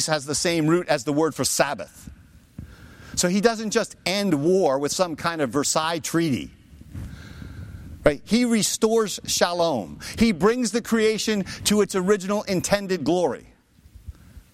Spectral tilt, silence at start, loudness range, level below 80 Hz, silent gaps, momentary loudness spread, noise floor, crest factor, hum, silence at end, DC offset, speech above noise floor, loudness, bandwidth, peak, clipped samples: -4 dB/octave; 0 s; 3 LU; -48 dBFS; none; 18 LU; -50 dBFS; 20 dB; none; 0.15 s; under 0.1%; 28 dB; -22 LUFS; 16.5 kHz; -4 dBFS; under 0.1%